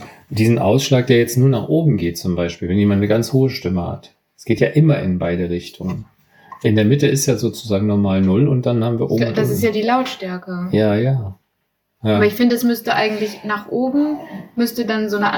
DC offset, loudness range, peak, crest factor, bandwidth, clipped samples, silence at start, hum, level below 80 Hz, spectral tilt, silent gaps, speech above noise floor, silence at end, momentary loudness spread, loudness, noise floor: under 0.1%; 3 LU; 0 dBFS; 18 dB; 19 kHz; under 0.1%; 0 s; none; -50 dBFS; -6.5 dB/octave; none; 54 dB; 0 s; 11 LU; -17 LUFS; -70 dBFS